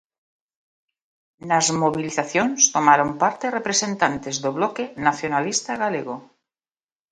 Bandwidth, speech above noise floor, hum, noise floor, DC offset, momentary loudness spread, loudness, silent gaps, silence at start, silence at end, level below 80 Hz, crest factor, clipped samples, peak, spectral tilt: 10.5 kHz; over 69 dB; none; under -90 dBFS; under 0.1%; 9 LU; -21 LUFS; none; 1.4 s; 0.9 s; -62 dBFS; 22 dB; under 0.1%; 0 dBFS; -2.5 dB/octave